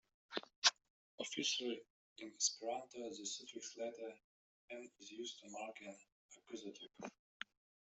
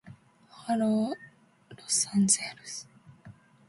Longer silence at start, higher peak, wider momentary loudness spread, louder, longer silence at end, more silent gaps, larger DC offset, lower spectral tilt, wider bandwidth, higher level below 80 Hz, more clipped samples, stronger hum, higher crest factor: first, 0.3 s vs 0.05 s; second, -16 dBFS vs -10 dBFS; about the same, 19 LU vs 18 LU; second, -43 LUFS vs -27 LUFS; first, 0.8 s vs 0.4 s; first, 0.56-0.62 s, 0.90-1.18 s, 1.90-2.16 s, 4.24-4.68 s, 6.12-6.29 s vs none; neither; second, 0 dB/octave vs -3.5 dB/octave; second, 8.2 kHz vs 11.5 kHz; second, under -90 dBFS vs -72 dBFS; neither; neither; first, 30 dB vs 22 dB